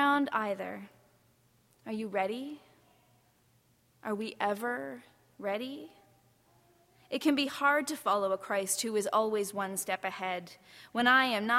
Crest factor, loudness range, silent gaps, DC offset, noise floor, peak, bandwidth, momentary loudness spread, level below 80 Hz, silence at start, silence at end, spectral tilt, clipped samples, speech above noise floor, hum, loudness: 22 dB; 9 LU; none; under 0.1%; -68 dBFS; -12 dBFS; 16.5 kHz; 17 LU; -78 dBFS; 0 s; 0 s; -3 dB/octave; under 0.1%; 36 dB; none; -32 LUFS